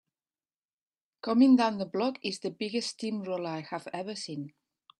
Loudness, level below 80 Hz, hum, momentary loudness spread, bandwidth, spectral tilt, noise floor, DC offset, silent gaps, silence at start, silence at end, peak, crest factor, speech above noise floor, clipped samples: -30 LUFS; -78 dBFS; none; 16 LU; 11 kHz; -5 dB/octave; under -90 dBFS; under 0.1%; none; 1.25 s; 0.5 s; -12 dBFS; 18 dB; over 61 dB; under 0.1%